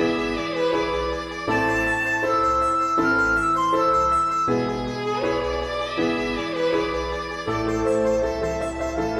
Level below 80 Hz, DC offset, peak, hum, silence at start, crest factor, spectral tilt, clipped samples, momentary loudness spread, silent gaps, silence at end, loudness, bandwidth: -40 dBFS; under 0.1%; -10 dBFS; none; 0 s; 12 dB; -5 dB/octave; under 0.1%; 7 LU; none; 0 s; -22 LUFS; 14.5 kHz